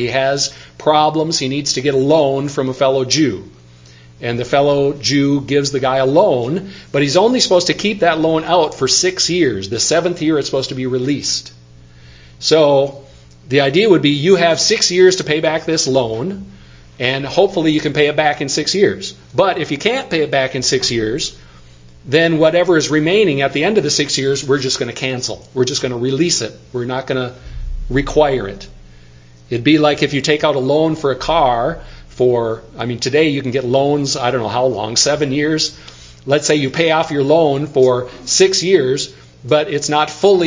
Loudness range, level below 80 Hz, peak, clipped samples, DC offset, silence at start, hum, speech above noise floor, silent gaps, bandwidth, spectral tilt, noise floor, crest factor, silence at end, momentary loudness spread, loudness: 4 LU; -40 dBFS; 0 dBFS; under 0.1%; under 0.1%; 0 s; none; 27 dB; none; 7.8 kHz; -4 dB/octave; -42 dBFS; 16 dB; 0 s; 9 LU; -15 LUFS